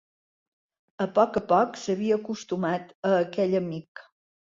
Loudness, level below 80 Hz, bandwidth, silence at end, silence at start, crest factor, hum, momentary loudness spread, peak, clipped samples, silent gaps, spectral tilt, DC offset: -26 LUFS; -66 dBFS; 7.6 kHz; 0.5 s; 1 s; 20 dB; none; 9 LU; -8 dBFS; under 0.1%; 2.95-3.03 s, 3.88-3.95 s; -6.5 dB/octave; under 0.1%